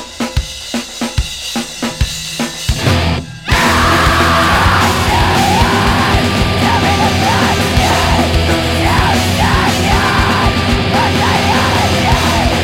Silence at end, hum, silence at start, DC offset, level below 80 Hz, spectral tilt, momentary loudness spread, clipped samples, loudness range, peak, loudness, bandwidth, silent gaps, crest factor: 0 s; none; 0 s; under 0.1%; -22 dBFS; -4.5 dB/octave; 9 LU; under 0.1%; 4 LU; 0 dBFS; -12 LUFS; 17 kHz; none; 12 dB